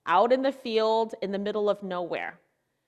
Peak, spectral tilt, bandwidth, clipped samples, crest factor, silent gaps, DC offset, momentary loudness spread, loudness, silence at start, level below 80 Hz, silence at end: -10 dBFS; -6 dB/octave; 10.5 kHz; under 0.1%; 16 dB; none; under 0.1%; 10 LU; -27 LUFS; 0.05 s; -78 dBFS; 0.55 s